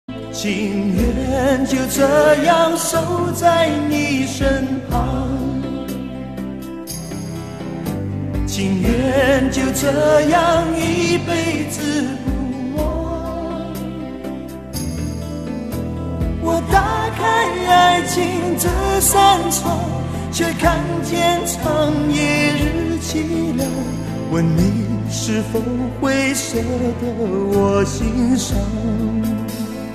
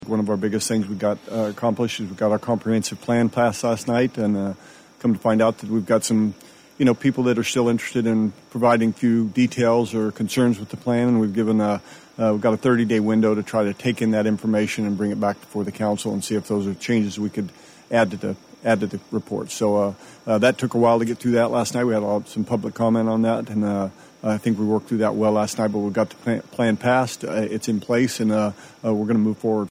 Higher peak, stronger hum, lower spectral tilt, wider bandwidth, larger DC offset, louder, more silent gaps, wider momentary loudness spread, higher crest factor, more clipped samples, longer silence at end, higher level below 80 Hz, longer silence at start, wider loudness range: first, 0 dBFS vs -6 dBFS; neither; about the same, -5 dB/octave vs -6 dB/octave; second, 14 kHz vs 15.5 kHz; first, 0.3% vs under 0.1%; first, -18 LUFS vs -22 LUFS; neither; first, 12 LU vs 7 LU; about the same, 16 dB vs 16 dB; neither; about the same, 0 s vs 0 s; first, -32 dBFS vs -62 dBFS; about the same, 0.1 s vs 0 s; first, 9 LU vs 3 LU